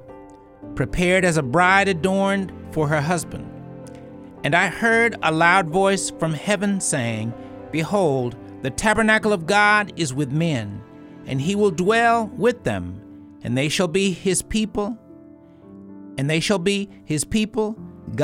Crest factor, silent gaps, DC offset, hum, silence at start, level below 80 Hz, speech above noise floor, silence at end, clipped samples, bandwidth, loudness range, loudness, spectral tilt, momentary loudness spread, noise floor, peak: 20 dB; none; under 0.1%; none; 0.05 s; -46 dBFS; 25 dB; 0 s; under 0.1%; 16.5 kHz; 5 LU; -20 LUFS; -4.5 dB/octave; 18 LU; -45 dBFS; -2 dBFS